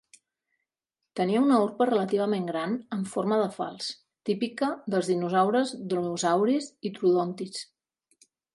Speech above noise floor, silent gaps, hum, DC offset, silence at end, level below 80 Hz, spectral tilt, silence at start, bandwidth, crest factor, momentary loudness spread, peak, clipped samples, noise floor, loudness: 60 dB; none; none; under 0.1%; 0.9 s; -78 dBFS; -5.5 dB/octave; 1.15 s; 11.5 kHz; 18 dB; 12 LU; -10 dBFS; under 0.1%; -87 dBFS; -27 LUFS